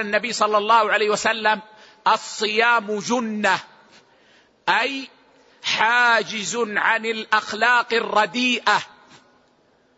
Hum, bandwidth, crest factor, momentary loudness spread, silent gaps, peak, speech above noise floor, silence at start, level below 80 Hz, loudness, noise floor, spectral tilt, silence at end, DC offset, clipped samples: none; 8 kHz; 18 dB; 8 LU; none; -4 dBFS; 40 dB; 0 s; -72 dBFS; -20 LUFS; -60 dBFS; -2 dB/octave; 1.1 s; under 0.1%; under 0.1%